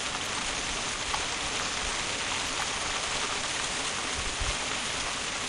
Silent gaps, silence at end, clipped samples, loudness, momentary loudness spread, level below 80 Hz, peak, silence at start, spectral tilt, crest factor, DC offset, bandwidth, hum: none; 0 s; under 0.1%; -29 LUFS; 1 LU; -46 dBFS; -14 dBFS; 0 s; -1 dB/octave; 16 dB; under 0.1%; 13 kHz; none